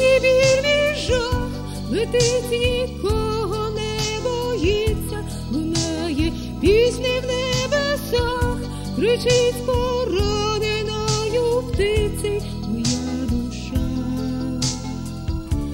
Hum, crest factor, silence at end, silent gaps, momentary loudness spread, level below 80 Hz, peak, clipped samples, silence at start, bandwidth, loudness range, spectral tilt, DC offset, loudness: none; 14 dB; 0 s; none; 9 LU; -32 dBFS; -6 dBFS; under 0.1%; 0 s; 16.5 kHz; 3 LU; -4.5 dB/octave; under 0.1%; -21 LUFS